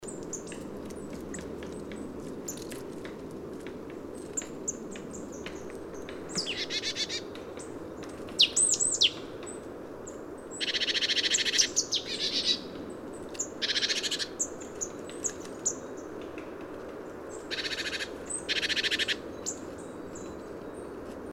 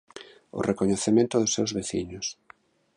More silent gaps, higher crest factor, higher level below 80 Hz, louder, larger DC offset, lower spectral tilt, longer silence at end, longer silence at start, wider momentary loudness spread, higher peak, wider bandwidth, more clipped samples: neither; first, 24 dB vs 18 dB; about the same, -58 dBFS vs -56 dBFS; second, -30 LUFS vs -26 LUFS; neither; second, -1 dB/octave vs -4.5 dB/octave; second, 0 s vs 0.65 s; second, 0 s vs 0.15 s; about the same, 17 LU vs 16 LU; about the same, -8 dBFS vs -10 dBFS; first, 16 kHz vs 11 kHz; neither